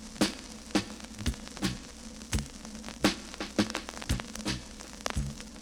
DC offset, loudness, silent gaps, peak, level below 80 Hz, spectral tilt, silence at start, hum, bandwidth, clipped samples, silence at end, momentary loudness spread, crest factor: under 0.1%; -34 LUFS; none; -10 dBFS; -44 dBFS; -4 dB/octave; 0 s; none; 18.5 kHz; under 0.1%; 0 s; 12 LU; 26 dB